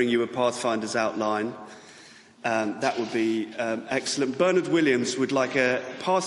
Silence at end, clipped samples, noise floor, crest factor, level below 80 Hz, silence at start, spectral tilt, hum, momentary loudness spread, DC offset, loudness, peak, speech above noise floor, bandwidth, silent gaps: 0 s; under 0.1%; -50 dBFS; 16 dB; -70 dBFS; 0 s; -4 dB/octave; none; 7 LU; under 0.1%; -25 LUFS; -8 dBFS; 25 dB; 11.5 kHz; none